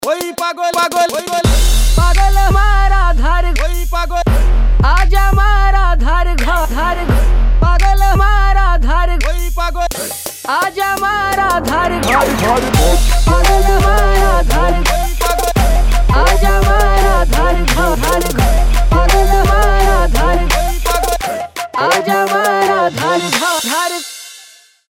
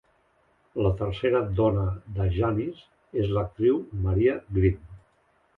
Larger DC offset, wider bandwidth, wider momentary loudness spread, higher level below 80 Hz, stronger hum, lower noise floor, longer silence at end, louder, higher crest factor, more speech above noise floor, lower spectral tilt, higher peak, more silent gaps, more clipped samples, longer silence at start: neither; first, 16.5 kHz vs 4.3 kHz; about the same, 6 LU vs 7 LU; first, -12 dBFS vs -40 dBFS; neither; second, -42 dBFS vs -66 dBFS; about the same, 0.5 s vs 0.6 s; first, -13 LUFS vs -26 LUFS; second, 10 dB vs 16 dB; second, 31 dB vs 41 dB; second, -4.5 dB/octave vs -10.5 dB/octave; first, 0 dBFS vs -10 dBFS; neither; neither; second, 0 s vs 0.75 s